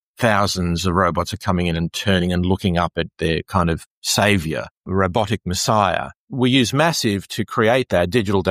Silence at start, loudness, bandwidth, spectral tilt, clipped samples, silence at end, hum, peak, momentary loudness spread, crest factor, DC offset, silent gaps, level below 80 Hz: 0.2 s; -19 LUFS; 15.5 kHz; -5 dB/octave; under 0.1%; 0 s; none; -2 dBFS; 7 LU; 18 dB; under 0.1%; 3.86-4.02 s, 4.71-4.84 s, 6.16-6.27 s; -40 dBFS